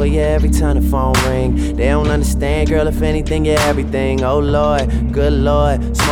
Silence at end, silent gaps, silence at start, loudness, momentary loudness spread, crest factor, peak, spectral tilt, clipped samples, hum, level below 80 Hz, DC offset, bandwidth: 0 s; none; 0 s; -15 LUFS; 3 LU; 12 dB; -2 dBFS; -6 dB/octave; under 0.1%; none; -18 dBFS; under 0.1%; 16.5 kHz